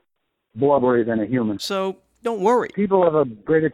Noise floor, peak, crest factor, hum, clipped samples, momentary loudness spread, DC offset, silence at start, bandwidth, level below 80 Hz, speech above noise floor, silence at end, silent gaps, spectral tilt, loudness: -75 dBFS; -6 dBFS; 16 dB; none; under 0.1%; 8 LU; under 0.1%; 0.55 s; 14 kHz; -58 dBFS; 56 dB; 0 s; none; -6.5 dB/octave; -20 LUFS